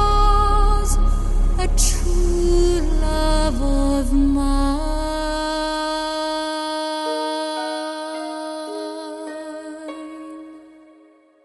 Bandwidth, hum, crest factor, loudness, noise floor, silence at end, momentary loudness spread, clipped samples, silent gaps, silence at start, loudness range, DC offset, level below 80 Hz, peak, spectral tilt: 12 kHz; none; 16 dB; -22 LUFS; -52 dBFS; 0.85 s; 14 LU; under 0.1%; none; 0 s; 10 LU; under 0.1%; -22 dBFS; -4 dBFS; -4.5 dB/octave